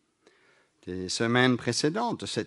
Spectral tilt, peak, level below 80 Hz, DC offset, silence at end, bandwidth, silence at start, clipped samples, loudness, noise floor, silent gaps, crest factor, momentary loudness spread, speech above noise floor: -4.5 dB/octave; -8 dBFS; -66 dBFS; under 0.1%; 0 s; 11.5 kHz; 0.85 s; under 0.1%; -27 LUFS; -64 dBFS; none; 22 dB; 15 LU; 37 dB